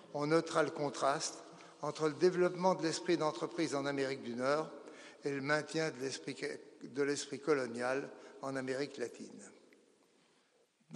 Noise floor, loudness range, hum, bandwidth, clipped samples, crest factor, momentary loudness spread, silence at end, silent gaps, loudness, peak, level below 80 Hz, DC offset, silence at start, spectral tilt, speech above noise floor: -73 dBFS; 5 LU; none; 11 kHz; under 0.1%; 20 dB; 14 LU; 0 s; none; -36 LUFS; -18 dBFS; -88 dBFS; under 0.1%; 0.05 s; -4.5 dB/octave; 37 dB